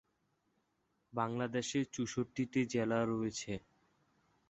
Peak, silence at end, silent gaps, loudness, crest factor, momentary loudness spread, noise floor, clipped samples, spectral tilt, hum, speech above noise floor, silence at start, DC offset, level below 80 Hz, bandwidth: -20 dBFS; 0.9 s; none; -37 LUFS; 20 dB; 9 LU; -80 dBFS; under 0.1%; -5.5 dB/octave; none; 44 dB; 1.15 s; under 0.1%; -70 dBFS; 8 kHz